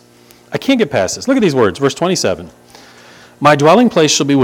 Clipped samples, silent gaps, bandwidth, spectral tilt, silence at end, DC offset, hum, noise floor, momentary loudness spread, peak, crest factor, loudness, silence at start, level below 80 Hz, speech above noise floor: 0.2%; none; 17 kHz; -4.5 dB/octave; 0 s; under 0.1%; 60 Hz at -45 dBFS; -44 dBFS; 9 LU; 0 dBFS; 14 dB; -12 LUFS; 0.5 s; -52 dBFS; 32 dB